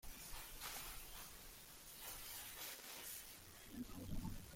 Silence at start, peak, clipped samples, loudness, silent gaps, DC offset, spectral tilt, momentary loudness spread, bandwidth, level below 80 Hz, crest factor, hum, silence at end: 0.05 s; -34 dBFS; under 0.1%; -52 LUFS; none; under 0.1%; -2.5 dB/octave; 7 LU; 16.5 kHz; -58 dBFS; 18 dB; none; 0 s